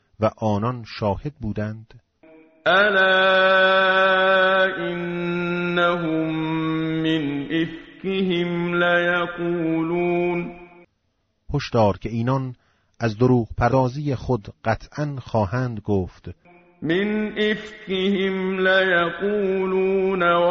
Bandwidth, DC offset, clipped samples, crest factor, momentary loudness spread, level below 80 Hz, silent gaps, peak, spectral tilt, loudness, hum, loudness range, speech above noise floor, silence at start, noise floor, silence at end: 7 kHz; under 0.1%; under 0.1%; 16 dB; 12 LU; -46 dBFS; none; -6 dBFS; -4 dB/octave; -21 LUFS; none; 7 LU; 50 dB; 0.2 s; -70 dBFS; 0 s